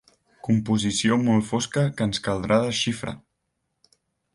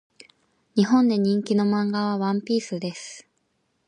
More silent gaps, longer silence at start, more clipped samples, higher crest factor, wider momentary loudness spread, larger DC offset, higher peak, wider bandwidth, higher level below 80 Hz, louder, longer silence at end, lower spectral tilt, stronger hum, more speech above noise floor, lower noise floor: neither; second, 0.45 s vs 0.75 s; neither; about the same, 18 dB vs 16 dB; second, 11 LU vs 15 LU; neither; about the same, -8 dBFS vs -8 dBFS; first, 11.5 kHz vs 9.8 kHz; first, -52 dBFS vs -72 dBFS; about the same, -23 LUFS vs -23 LUFS; first, 1.15 s vs 0.65 s; second, -5 dB/octave vs -6.5 dB/octave; neither; first, 54 dB vs 49 dB; first, -77 dBFS vs -71 dBFS